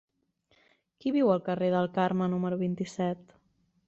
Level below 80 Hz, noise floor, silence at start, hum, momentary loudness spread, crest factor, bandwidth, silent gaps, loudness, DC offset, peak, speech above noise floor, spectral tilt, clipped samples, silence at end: -70 dBFS; -71 dBFS; 1.05 s; none; 7 LU; 18 dB; 8 kHz; none; -29 LUFS; under 0.1%; -12 dBFS; 43 dB; -7.5 dB/octave; under 0.1%; 0.7 s